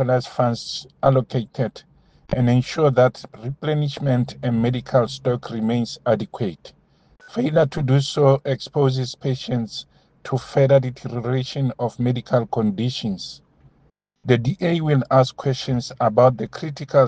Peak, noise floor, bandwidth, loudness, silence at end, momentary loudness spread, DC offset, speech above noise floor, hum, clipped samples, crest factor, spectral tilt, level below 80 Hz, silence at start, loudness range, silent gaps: 0 dBFS; -61 dBFS; 8.8 kHz; -21 LUFS; 0 s; 11 LU; under 0.1%; 41 dB; none; under 0.1%; 20 dB; -7 dB/octave; -52 dBFS; 0 s; 3 LU; none